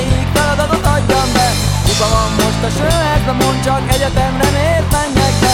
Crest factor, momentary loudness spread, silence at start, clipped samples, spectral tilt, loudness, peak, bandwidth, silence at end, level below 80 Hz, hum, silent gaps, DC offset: 12 dB; 2 LU; 0 s; under 0.1%; -4.5 dB/octave; -13 LUFS; 0 dBFS; 18 kHz; 0 s; -22 dBFS; none; none; under 0.1%